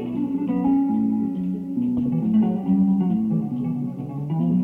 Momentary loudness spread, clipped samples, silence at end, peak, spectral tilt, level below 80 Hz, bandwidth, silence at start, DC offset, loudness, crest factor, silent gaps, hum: 7 LU; under 0.1%; 0 s; -10 dBFS; -11.5 dB/octave; -56 dBFS; 3.3 kHz; 0 s; under 0.1%; -23 LUFS; 10 dB; none; none